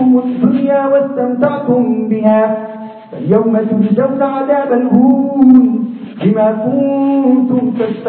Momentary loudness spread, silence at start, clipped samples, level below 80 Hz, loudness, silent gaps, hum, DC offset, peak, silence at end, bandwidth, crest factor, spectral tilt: 7 LU; 0 s; 0.2%; -56 dBFS; -12 LUFS; none; none; under 0.1%; 0 dBFS; 0 s; 4 kHz; 12 dB; -12.5 dB/octave